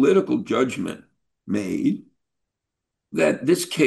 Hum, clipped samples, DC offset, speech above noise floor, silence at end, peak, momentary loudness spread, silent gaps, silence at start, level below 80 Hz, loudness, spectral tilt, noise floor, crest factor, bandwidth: none; under 0.1%; under 0.1%; 62 dB; 0 s; -6 dBFS; 12 LU; none; 0 s; -66 dBFS; -23 LUFS; -5.5 dB/octave; -83 dBFS; 16 dB; 12.5 kHz